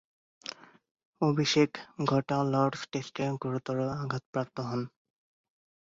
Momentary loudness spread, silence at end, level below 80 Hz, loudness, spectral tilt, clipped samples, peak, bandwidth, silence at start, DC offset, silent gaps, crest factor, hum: 15 LU; 0.95 s; -68 dBFS; -31 LUFS; -6 dB/octave; under 0.1%; -12 dBFS; 7.8 kHz; 0.45 s; under 0.1%; 0.91-0.95 s, 1.05-1.13 s, 4.26-4.33 s; 20 dB; none